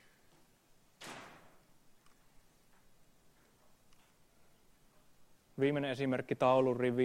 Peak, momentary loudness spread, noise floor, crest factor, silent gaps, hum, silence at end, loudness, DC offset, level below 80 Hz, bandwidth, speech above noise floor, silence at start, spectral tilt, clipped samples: -16 dBFS; 23 LU; -67 dBFS; 22 dB; none; none; 0 s; -33 LUFS; under 0.1%; -72 dBFS; 15.5 kHz; 35 dB; 1 s; -7 dB/octave; under 0.1%